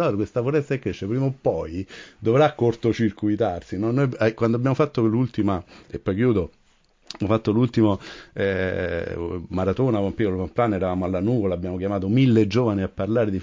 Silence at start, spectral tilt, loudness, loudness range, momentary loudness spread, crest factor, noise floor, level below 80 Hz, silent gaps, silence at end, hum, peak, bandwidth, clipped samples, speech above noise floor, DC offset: 0 s; -8.5 dB/octave; -23 LUFS; 2 LU; 10 LU; 16 dB; -60 dBFS; -44 dBFS; none; 0 s; none; -6 dBFS; 7.6 kHz; under 0.1%; 38 dB; under 0.1%